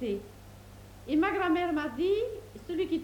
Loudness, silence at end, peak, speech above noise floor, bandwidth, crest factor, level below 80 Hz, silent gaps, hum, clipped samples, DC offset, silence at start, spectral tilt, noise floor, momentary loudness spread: -30 LUFS; 0 s; -18 dBFS; 20 dB; 19 kHz; 14 dB; -54 dBFS; none; none; under 0.1%; under 0.1%; 0 s; -6 dB/octave; -49 dBFS; 23 LU